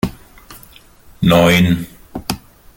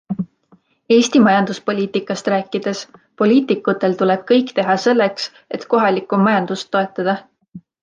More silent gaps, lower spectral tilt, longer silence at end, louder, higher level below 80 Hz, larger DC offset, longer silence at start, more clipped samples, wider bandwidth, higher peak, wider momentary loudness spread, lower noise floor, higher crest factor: neither; about the same, -5.5 dB/octave vs -5.5 dB/octave; first, 0.4 s vs 0.25 s; about the same, -15 LUFS vs -17 LUFS; first, -40 dBFS vs -64 dBFS; neither; about the same, 0.05 s vs 0.1 s; neither; first, 17 kHz vs 9.6 kHz; about the same, 0 dBFS vs -2 dBFS; first, 18 LU vs 12 LU; second, -43 dBFS vs -55 dBFS; about the same, 18 dB vs 14 dB